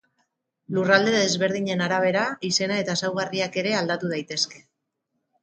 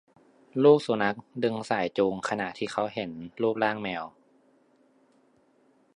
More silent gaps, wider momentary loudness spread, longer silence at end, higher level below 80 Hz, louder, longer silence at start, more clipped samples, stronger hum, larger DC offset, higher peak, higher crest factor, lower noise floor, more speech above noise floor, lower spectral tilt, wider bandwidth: neither; second, 7 LU vs 15 LU; second, 0.85 s vs 1.85 s; about the same, -70 dBFS vs -70 dBFS; first, -23 LUFS vs -27 LUFS; first, 0.7 s vs 0.55 s; neither; neither; neither; about the same, -4 dBFS vs -6 dBFS; about the same, 22 dB vs 22 dB; first, -78 dBFS vs -64 dBFS; first, 55 dB vs 38 dB; second, -3.5 dB/octave vs -6 dB/octave; second, 9.4 kHz vs 10.5 kHz